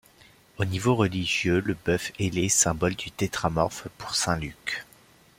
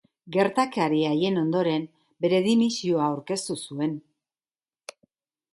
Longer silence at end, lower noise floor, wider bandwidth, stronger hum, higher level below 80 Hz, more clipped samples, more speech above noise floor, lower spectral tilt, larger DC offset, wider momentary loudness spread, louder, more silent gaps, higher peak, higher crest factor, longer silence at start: second, 0.55 s vs 1.55 s; second, -56 dBFS vs under -90 dBFS; first, 16.5 kHz vs 11.5 kHz; neither; first, -50 dBFS vs -72 dBFS; neither; second, 30 dB vs over 66 dB; second, -4 dB/octave vs -5.5 dB/octave; neither; second, 10 LU vs 19 LU; about the same, -26 LUFS vs -25 LUFS; neither; about the same, -6 dBFS vs -8 dBFS; about the same, 20 dB vs 18 dB; first, 0.6 s vs 0.25 s